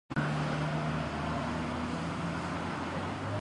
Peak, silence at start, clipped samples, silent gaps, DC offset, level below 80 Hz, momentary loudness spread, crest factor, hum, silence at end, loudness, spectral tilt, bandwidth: -18 dBFS; 0.1 s; under 0.1%; none; under 0.1%; -50 dBFS; 3 LU; 16 dB; none; 0 s; -34 LUFS; -6.5 dB/octave; 11 kHz